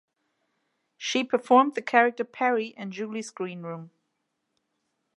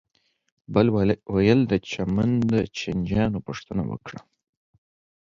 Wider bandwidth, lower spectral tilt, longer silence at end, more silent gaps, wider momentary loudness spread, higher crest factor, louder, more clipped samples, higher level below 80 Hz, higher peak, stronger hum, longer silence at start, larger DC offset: first, 11 kHz vs 7.6 kHz; second, -4 dB/octave vs -7.5 dB/octave; first, 1.3 s vs 1 s; neither; first, 15 LU vs 12 LU; first, 24 dB vs 18 dB; about the same, -25 LUFS vs -24 LUFS; neither; second, -84 dBFS vs -46 dBFS; about the same, -4 dBFS vs -6 dBFS; neither; first, 1 s vs 0.7 s; neither